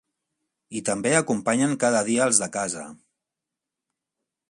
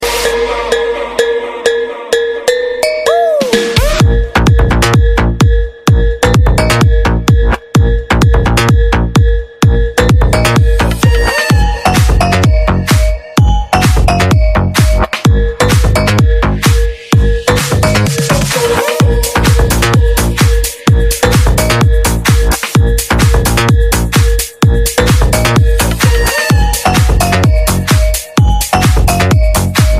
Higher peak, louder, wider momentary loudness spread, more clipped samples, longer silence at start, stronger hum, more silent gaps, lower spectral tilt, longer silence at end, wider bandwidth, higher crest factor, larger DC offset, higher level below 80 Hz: second, -4 dBFS vs 0 dBFS; second, -22 LUFS vs -10 LUFS; first, 13 LU vs 3 LU; neither; first, 0.7 s vs 0 s; neither; neither; second, -3.5 dB/octave vs -5 dB/octave; first, 1.55 s vs 0 s; second, 11.5 kHz vs 16 kHz; first, 22 dB vs 8 dB; neither; second, -68 dBFS vs -14 dBFS